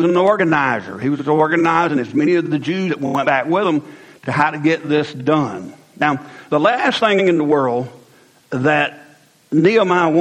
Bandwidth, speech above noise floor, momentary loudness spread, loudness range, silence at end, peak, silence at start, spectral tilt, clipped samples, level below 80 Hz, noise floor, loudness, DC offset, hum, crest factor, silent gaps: 9.8 kHz; 34 dB; 9 LU; 2 LU; 0 s; 0 dBFS; 0 s; -6.5 dB/octave; under 0.1%; -62 dBFS; -50 dBFS; -17 LUFS; under 0.1%; none; 16 dB; none